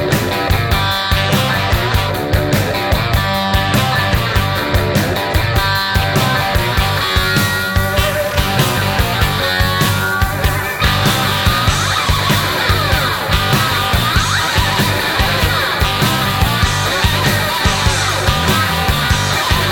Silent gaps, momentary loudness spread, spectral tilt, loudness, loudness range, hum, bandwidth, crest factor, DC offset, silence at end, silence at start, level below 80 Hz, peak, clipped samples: none; 2 LU; -4 dB/octave; -14 LUFS; 1 LU; none; 19 kHz; 14 dB; under 0.1%; 0 s; 0 s; -24 dBFS; 0 dBFS; under 0.1%